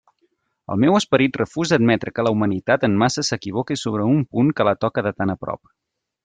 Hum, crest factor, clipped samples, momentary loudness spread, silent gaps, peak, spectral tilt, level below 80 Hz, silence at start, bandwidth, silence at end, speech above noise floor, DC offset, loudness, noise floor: none; 16 dB; under 0.1%; 8 LU; none; -4 dBFS; -5.5 dB/octave; -56 dBFS; 0.7 s; 9.4 kHz; 0.7 s; 48 dB; under 0.1%; -20 LUFS; -67 dBFS